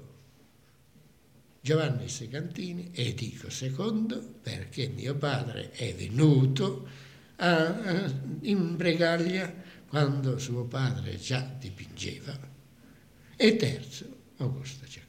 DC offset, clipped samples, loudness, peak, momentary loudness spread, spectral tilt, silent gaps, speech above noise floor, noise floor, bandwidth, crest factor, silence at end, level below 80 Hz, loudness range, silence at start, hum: under 0.1%; under 0.1%; -30 LUFS; -10 dBFS; 16 LU; -6 dB/octave; none; 32 dB; -61 dBFS; 15 kHz; 22 dB; 0.05 s; -68 dBFS; 6 LU; 0 s; none